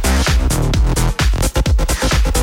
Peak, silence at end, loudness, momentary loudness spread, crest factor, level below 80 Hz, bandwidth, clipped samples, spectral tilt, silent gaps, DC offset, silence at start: -2 dBFS; 0 s; -16 LUFS; 2 LU; 12 dB; -16 dBFS; 17 kHz; under 0.1%; -4.5 dB/octave; none; under 0.1%; 0 s